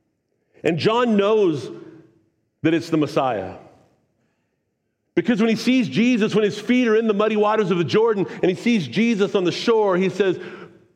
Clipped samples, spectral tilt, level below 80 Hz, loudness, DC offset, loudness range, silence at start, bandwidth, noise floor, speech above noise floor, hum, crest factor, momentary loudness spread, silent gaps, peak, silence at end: under 0.1%; -6 dB/octave; -68 dBFS; -20 LUFS; under 0.1%; 6 LU; 0.65 s; 11 kHz; -73 dBFS; 54 dB; none; 16 dB; 8 LU; none; -6 dBFS; 0.3 s